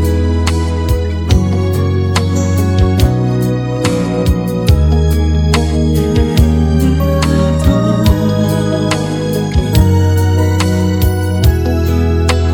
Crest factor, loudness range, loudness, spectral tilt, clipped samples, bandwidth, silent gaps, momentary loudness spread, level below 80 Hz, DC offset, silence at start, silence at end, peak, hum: 12 dB; 1 LU; -13 LUFS; -6.5 dB/octave; 0.2%; 17.5 kHz; none; 4 LU; -18 dBFS; under 0.1%; 0 s; 0 s; 0 dBFS; none